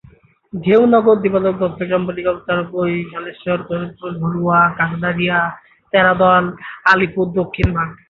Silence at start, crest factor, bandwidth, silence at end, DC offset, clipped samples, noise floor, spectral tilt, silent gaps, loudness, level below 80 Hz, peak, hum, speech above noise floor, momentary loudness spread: 0.55 s; 16 dB; 7 kHz; 0.15 s; under 0.1%; under 0.1%; -48 dBFS; -8 dB/octave; none; -16 LUFS; -38 dBFS; 0 dBFS; none; 31 dB; 12 LU